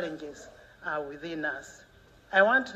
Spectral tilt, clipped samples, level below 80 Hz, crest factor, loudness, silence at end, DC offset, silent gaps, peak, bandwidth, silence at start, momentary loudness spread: -4 dB/octave; under 0.1%; -64 dBFS; 22 dB; -28 LUFS; 0 s; under 0.1%; none; -10 dBFS; 13 kHz; 0 s; 22 LU